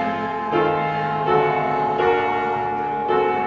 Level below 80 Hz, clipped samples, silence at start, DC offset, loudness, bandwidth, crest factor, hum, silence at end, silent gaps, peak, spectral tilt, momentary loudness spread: -52 dBFS; under 0.1%; 0 s; under 0.1%; -21 LUFS; 7.2 kHz; 14 dB; none; 0 s; none; -6 dBFS; -7.5 dB/octave; 5 LU